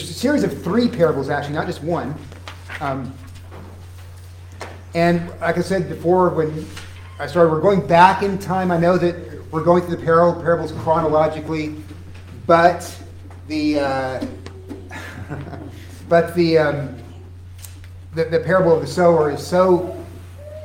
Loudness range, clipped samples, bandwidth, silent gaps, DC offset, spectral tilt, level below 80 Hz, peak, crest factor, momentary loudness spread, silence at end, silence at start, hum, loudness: 9 LU; under 0.1%; 16.5 kHz; none; under 0.1%; -6.5 dB/octave; -52 dBFS; 0 dBFS; 20 dB; 22 LU; 0 s; 0 s; none; -18 LUFS